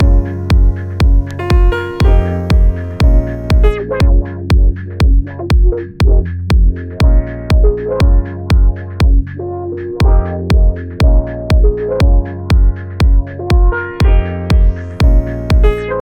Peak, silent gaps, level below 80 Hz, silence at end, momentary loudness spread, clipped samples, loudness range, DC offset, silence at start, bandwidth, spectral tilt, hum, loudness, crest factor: 0 dBFS; none; -12 dBFS; 0 s; 4 LU; under 0.1%; 1 LU; 0.2%; 0 s; 8.2 kHz; -7.5 dB/octave; none; -14 LUFS; 10 dB